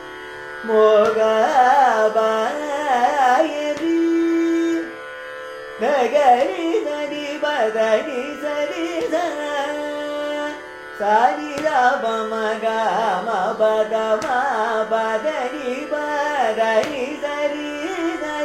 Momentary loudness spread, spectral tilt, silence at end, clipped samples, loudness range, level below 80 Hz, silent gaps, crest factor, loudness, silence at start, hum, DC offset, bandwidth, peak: 11 LU; -3.5 dB/octave; 0 s; under 0.1%; 5 LU; -60 dBFS; none; 16 dB; -19 LUFS; 0 s; none; under 0.1%; 15 kHz; -2 dBFS